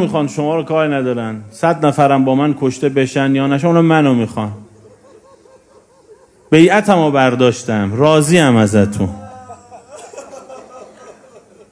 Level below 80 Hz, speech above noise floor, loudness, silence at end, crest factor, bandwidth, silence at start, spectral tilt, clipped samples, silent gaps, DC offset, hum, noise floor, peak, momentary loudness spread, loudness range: -52 dBFS; 35 dB; -13 LUFS; 0.6 s; 14 dB; 11 kHz; 0 s; -6 dB/octave; 0.2%; none; under 0.1%; none; -48 dBFS; 0 dBFS; 23 LU; 5 LU